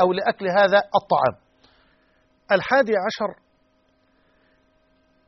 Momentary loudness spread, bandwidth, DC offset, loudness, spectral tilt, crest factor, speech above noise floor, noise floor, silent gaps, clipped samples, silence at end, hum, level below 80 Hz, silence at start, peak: 8 LU; 6.2 kHz; under 0.1%; -21 LUFS; -2.5 dB/octave; 20 dB; 44 dB; -64 dBFS; none; under 0.1%; 1.95 s; none; -64 dBFS; 0 s; -4 dBFS